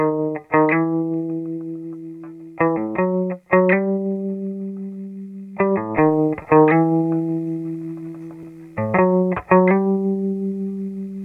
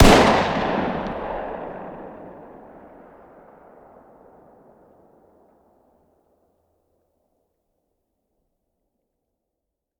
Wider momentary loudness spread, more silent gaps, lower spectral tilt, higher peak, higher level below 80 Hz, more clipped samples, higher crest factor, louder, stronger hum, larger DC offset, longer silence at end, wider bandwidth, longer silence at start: second, 18 LU vs 29 LU; neither; first, -11 dB/octave vs -5 dB/octave; about the same, 0 dBFS vs 0 dBFS; second, -56 dBFS vs -34 dBFS; neither; about the same, 20 dB vs 24 dB; about the same, -20 LUFS vs -21 LUFS; first, 50 Hz at -60 dBFS vs none; neither; second, 0 s vs 7.4 s; second, 3.5 kHz vs 18.5 kHz; about the same, 0 s vs 0 s